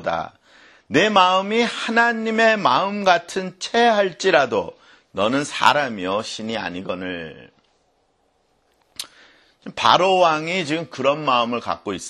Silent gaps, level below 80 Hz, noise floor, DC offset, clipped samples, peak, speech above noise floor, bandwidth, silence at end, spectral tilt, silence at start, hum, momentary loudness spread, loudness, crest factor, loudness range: none; -60 dBFS; -65 dBFS; under 0.1%; under 0.1%; 0 dBFS; 45 dB; 13 kHz; 0 s; -3.5 dB/octave; 0 s; none; 17 LU; -19 LUFS; 20 dB; 12 LU